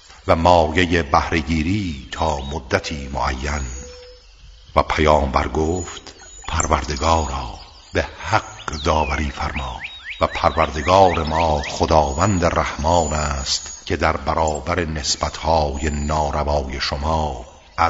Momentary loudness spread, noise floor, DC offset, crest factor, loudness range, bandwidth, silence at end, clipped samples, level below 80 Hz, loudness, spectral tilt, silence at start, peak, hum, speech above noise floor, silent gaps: 11 LU; -44 dBFS; under 0.1%; 20 dB; 5 LU; 8 kHz; 0 s; under 0.1%; -30 dBFS; -20 LUFS; -4.5 dB/octave; 0.1 s; 0 dBFS; none; 25 dB; none